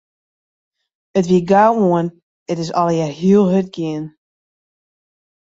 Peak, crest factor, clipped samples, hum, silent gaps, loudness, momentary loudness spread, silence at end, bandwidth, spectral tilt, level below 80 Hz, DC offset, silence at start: -2 dBFS; 16 dB; under 0.1%; none; 2.23-2.46 s; -16 LUFS; 13 LU; 1.5 s; 7.8 kHz; -7.5 dB/octave; -58 dBFS; under 0.1%; 1.15 s